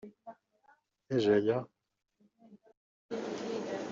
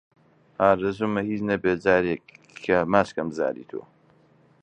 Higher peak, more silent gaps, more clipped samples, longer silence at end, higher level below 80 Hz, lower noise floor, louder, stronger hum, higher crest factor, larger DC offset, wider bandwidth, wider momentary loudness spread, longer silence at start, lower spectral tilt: second, -16 dBFS vs -2 dBFS; first, 2.77-3.09 s vs none; neither; second, 0 s vs 0.8 s; second, -76 dBFS vs -56 dBFS; first, -69 dBFS vs -59 dBFS; second, -33 LUFS vs -24 LUFS; neither; about the same, 20 dB vs 22 dB; neither; second, 7.6 kHz vs 9.6 kHz; first, 24 LU vs 15 LU; second, 0.05 s vs 0.6 s; second, -5.5 dB/octave vs -7 dB/octave